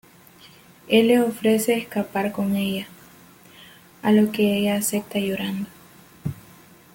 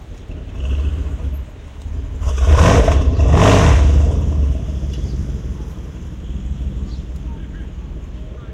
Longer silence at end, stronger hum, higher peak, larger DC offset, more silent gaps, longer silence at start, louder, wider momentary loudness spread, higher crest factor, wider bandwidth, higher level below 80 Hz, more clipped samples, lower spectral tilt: first, 0.55 s vs 0 s; neither; second, -6 dBFS vs 0 dBFS; neither; neither; first, 0.85 s vs 0 s; second, -22 LUFS vs -16 LUFS; second, 15 LU vs 20 LU; about the same, 18 dB vs 16 dB; first, 17 kHz vs 9.6 kHz; second, -60 dBFS vs -18 dBFS; neither; second, -5 dB/octave vs -6.5 dB/octave